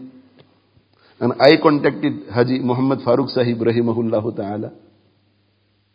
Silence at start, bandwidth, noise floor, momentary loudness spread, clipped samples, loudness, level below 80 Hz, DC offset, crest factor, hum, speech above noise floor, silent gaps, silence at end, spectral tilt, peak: 0 s; 8 kHz; -62 dBFS; 12 LU; under 0.1%; -18 LUFS; -60 dBFS; under 0.1%; 20 dB; none; 45 dB; none; 1.2 s; -8.5 dB/octave; 0 dBFS